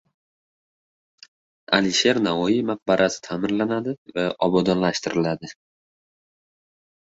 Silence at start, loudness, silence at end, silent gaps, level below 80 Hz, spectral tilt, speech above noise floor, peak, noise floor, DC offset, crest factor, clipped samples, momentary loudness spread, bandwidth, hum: 1.7 s; -22 LUFS; 1.7 s; 3.98-4.06 s; -60 dBFS; -4.5 dB/octave; over 68 dB; -2 dBFS; under -90 dBFS; under 0.1%; 22 dB; under 0.1%; 8 LU; 8 kHz; none